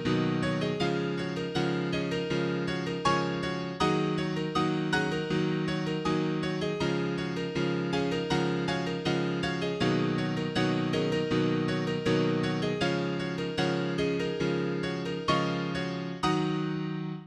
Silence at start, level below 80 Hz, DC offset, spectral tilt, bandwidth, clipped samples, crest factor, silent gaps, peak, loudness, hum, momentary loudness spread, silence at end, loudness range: 0 s; -56 dBFS; under 0.1%; -6 dB/octave; 11 kHz; under 0.1%; 16 dB; none; -12 dBFS; -29 LUFS; none; 4 LU; 0 s; 1 LU